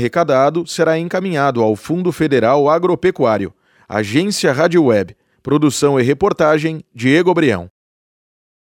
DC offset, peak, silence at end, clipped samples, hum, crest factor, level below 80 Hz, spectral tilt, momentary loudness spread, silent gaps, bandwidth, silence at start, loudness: under 0.1%; -2 dBFS; 0.95 s; under 0.1%; none; 14 dB; -52 dBFS; -5.5 dB/octave; 7 LU; none; 17 kHz; 0 s; -15 LUFS